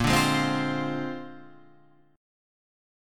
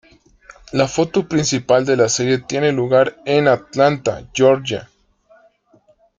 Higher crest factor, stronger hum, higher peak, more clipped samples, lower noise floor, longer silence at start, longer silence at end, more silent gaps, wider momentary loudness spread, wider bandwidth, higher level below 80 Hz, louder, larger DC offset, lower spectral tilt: about the same, 20 dB vs 16 dB; neither; second, -10 dBFS vs -2 dBFS; neither; first, -59 dBFS vs -55 dBFS; second, 0 s vs 0.75 s; second, 0.95 s vs 1.35 s; neither; first, 17 LU vs 7 LU; first, 17.5 kHz vs 9.6 kHz; about the same, -48 dBFS vs -52 dBFS; second, -26 LUFS vs -17 LUFS; neither; about the same, -4.5 dB/octave vs -4.5 dB/octave